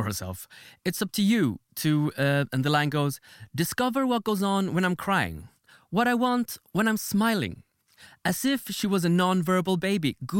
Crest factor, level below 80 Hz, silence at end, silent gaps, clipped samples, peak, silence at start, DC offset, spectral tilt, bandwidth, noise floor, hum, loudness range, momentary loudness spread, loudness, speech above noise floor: 16 dB; -60 dBFS; 0 s; none; under 0.1%; -10 dBFS; 0 s; under 0.1%; -5 dB/octave; 17 kHz; -55 dBFS; none; 1 LU; 9 LU; -26 LUFS; 29 dB